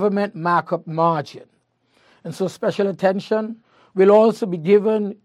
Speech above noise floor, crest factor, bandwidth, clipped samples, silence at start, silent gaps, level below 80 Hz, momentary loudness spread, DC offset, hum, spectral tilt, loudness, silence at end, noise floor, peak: 44 dB; 16 dB; 12 kHz; under 0.1%; 0 s; none; -72 dBFS; 17 LU; under 0.1%; none; -7 dB/octave; -19 LUFS; 0.1 s; -62 dBFS; -2 dBFS